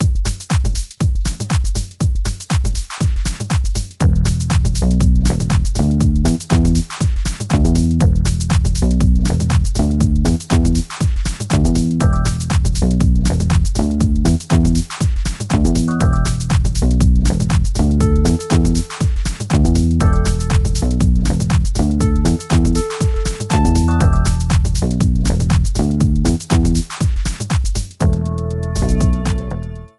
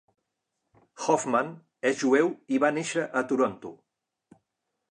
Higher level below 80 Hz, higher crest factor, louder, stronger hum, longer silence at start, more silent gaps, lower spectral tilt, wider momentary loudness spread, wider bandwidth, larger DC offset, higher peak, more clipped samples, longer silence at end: first, -18 dBFS vs -78 dBFS; second, 14 dB vs 20 dB; first, -17 LUFS vs -27 LUFS; neither; second, 0 s vs 1 s; neither; first, -6 dB/octave vs -4.5 dB/octave; second, 5 LU vs 10 LU; about the same, 12 kHz vs 11 kHz; neither; first, 0 dBFS vs -8 dBFS; neither; second, 0.1 s vs 1.15 s